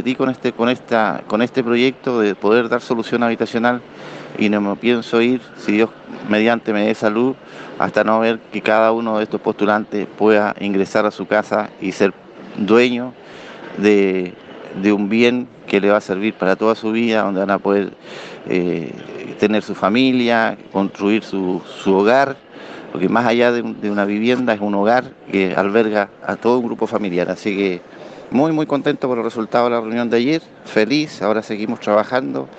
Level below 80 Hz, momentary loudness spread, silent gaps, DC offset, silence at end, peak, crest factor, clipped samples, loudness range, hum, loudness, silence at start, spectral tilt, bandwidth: -62 dBFS; 10 LU; none; under 0.1%; 0 s; 0 dBFS; 18 dB; under 0.1%; 2 LU; none; -17 LUFS; 0 s; -6 dB/octave; 8.4 kHz